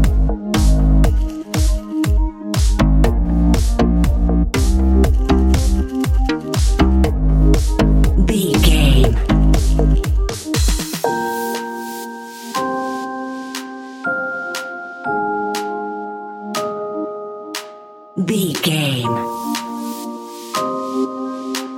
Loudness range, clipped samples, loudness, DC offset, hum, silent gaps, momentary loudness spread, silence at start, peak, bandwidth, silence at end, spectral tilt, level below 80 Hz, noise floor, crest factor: 9 LU; under 0.1%; -18 LUFS; under 0.1%; none; none; 12 LU; 0 s; 0 dBFS; 16.5 kHz; 0 s; -5.5 dB/octave; -18 dBFS; -39 dBFS; 16 dB